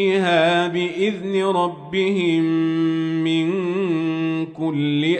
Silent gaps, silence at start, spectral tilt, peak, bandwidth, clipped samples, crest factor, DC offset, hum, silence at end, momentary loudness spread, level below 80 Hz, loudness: none; 0 s; -6.5 dB/octave; -6 dBFS; 9 kHz; under 0.1%; 14 dB; under 0.1%; none; 0 s; 6 LU; -66 dBFS; -20 LUFS